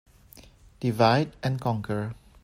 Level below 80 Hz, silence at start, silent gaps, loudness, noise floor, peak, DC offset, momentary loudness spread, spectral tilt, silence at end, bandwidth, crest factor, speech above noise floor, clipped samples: -56 dBFS; 0.35 s; none; -26 LUFS; -52 dBFS; -6 dBFS; under 0.1%; 10 LU; -7 dB/octave; 0.3 s; 16 kHz; 20 dB; 27 dB; under 0.1%